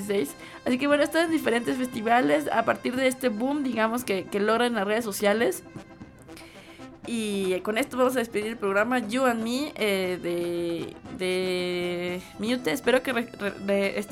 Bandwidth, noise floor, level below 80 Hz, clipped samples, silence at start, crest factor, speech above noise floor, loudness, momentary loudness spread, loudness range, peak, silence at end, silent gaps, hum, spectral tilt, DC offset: 17 kHz; -46 dBFS; -60 dBFS; under 0.1%; 0 s; 18 dB; 20 dB; -26 LUFS; 11 LU; 4 LU; -8 dBFS; 0 s; none; none; -4.5 dB/octave; under 0.1%